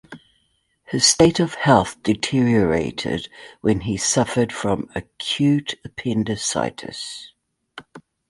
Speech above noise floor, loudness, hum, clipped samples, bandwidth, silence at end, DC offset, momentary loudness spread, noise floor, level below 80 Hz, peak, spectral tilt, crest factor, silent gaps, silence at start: 46 dB; -20 LUFS; none; under 0.1%; 11.5 kHz; 0.3 s; under 0.1%; 15 LU; -67 dBFS; -48 dBFS; -2 dBFS; -4 dB/octave; 20 dB; none; 0.1 s